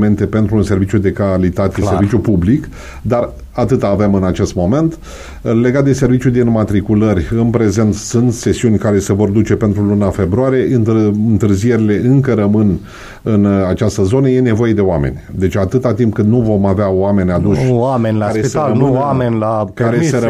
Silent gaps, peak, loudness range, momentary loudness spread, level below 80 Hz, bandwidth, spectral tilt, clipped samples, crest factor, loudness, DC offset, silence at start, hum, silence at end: none; 0 dBFS; 2 LU; 5 LU; -34 dBFS; 13 kHz; -7.5 dB/octave; under 0.1%; 12 dB; -13 LUFS; under 0.1%; 0 s; none; 0 s